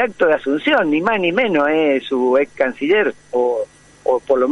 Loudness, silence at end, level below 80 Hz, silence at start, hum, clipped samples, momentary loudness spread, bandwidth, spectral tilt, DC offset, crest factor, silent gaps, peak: -17 LUFS; 0 s; -56 dBFS; 0 s; 50 Hz at -60 dBFS; under 0.1%; 5 LU; 11 kHz; -6 dB/octave; under 0.1%; 14 dB; none; -2 dBFS